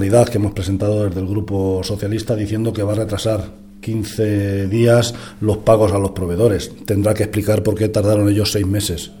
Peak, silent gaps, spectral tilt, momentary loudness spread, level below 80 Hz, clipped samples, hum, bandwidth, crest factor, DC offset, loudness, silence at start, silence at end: 0 dBFS; none; -6.5 dB/octave; 9 LU; -40 dBFS; under 0.1%; none; 18 kHz; 16 dB; 0.4%; -18 LUFS; 0 s; 0 s